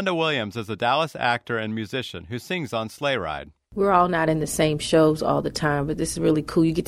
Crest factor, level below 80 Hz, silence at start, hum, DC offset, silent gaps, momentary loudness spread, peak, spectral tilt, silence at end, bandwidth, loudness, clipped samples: 18 dB; -48 dBFS; 0 s; none; under 0.1%; none; 11 LU; -4 dBFS; -5 dB/octave; 0 s; 15.5 kHz; -23 LUFS; under 0.1%